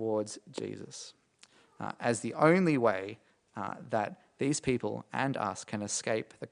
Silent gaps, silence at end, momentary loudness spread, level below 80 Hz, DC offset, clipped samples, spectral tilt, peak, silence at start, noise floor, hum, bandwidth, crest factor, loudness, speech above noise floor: none; 0.05 s; 18 LU; -68 dBFS; under 0.1%; under 0.1%; -5 dB/octave; -10 dBFS; 0 s; -63 dBFS; none; 10 kHz; 22 dB; -32 LUFS; 31 dB